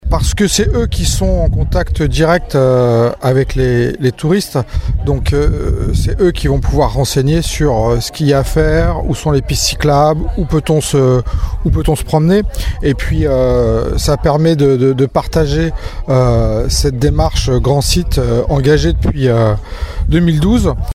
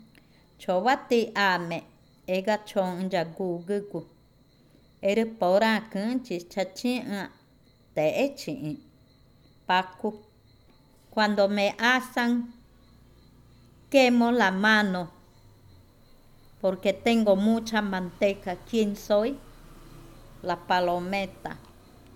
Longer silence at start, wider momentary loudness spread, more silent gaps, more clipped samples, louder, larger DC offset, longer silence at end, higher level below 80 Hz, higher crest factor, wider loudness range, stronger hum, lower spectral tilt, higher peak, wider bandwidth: second, 0.05 s vs 0.6 s; second, 5 LU vs 14 LU; neither; neither; first, -13 LUFS vs -26 LUFS; neither; second, 0 s vs 0.6 s; first, -18 dBFS vs -58 dBFS; second, 12 dB vs 20 dB; second, 1 LU vs 6 LU; neither; about the same, -6 dB/octave vs -5 dB/octave; first, 0 dBFS vs -8 dBFS; about the same, 16 kHz vs 16.5 kHz